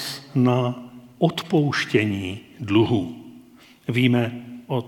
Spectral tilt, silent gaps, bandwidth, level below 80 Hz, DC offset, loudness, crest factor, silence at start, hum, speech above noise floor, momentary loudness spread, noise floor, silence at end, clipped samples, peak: -6.5 dB/octave; none; 18 kHz; -62 dBFS; under 0.1%; -22 LUFS; 18 dB; 0 s; none; 28 dB; 15 LU; -49 dBFS; 0 s; under 0.1%; -4 dBFS